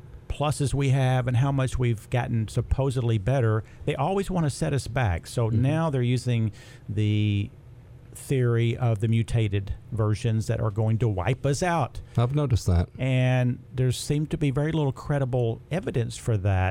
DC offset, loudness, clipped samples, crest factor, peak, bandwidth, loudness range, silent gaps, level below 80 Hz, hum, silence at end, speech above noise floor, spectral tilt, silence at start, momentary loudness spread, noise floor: under 0.1%; -26 LUFS; under 0.1%; 14 dB; -10 dBFS; 13.5 kHz; 2 LU; none; -42 dBFS; none; 0 s; 22 dB; -7 dB/octave; 0.05 s; 5 LU; -46 dBFS